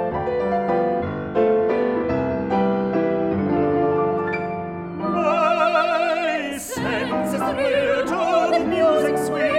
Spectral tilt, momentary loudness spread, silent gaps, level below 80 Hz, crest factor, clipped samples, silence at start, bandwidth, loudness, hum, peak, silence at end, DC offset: -6 dB/octave; 7 LU; none; -50 dBFS; 14 dB; under 0.1%; 0 s; 16 kHz; -21 LUFS; none; -6 dBFS; 0 s; under 0.1%